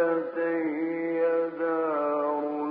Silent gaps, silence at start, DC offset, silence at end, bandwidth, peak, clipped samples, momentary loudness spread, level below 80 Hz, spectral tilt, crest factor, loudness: none; 0 s; under 0.1%; 0 s; 4.7 kHz; -14 dBFS; under 0.1%; 3 LU; -80 dBFS; -5.5 dB/octave; 12 dB; -28 LUFS